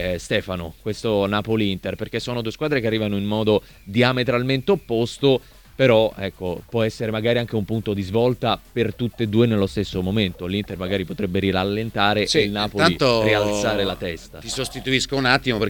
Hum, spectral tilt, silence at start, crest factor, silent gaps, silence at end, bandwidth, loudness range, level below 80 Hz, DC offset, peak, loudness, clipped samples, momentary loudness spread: none; -5.5 dB/octave; 0 s; 20 dB; none; 0 s; 19 kHz; 3 LU; -44 dBFS; under 0.1%; -2 dBFS; -21 LUFS; under 0.1%; 9 LU